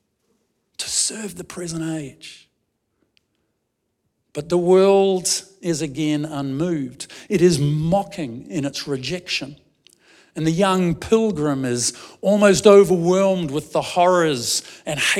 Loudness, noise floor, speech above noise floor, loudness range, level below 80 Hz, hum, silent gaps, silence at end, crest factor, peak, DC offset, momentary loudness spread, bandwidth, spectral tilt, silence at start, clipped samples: -19 LUFS; -74 dBFS; 55 dB; 11 LU; -52 dBFS; none; none; 0 s; 20 dB; 0 dBFS; under 0.1%; 17 LU; 15.5 kHz; -4.5 dB/octave; 0.8 s; under 0.1%